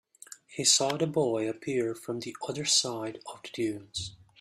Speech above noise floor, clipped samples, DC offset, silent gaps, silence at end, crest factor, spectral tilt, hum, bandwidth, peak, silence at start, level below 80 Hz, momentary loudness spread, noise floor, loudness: 22 dB; under 0.1%; under 0.1%; none; 0.25 s; 22 dB; -2.5 dB/octave; none; 15.5 kHz; -10 dBFS; 0.3 s; -68 dBFS; 18 LU; -52 dBFS; -29 LUFS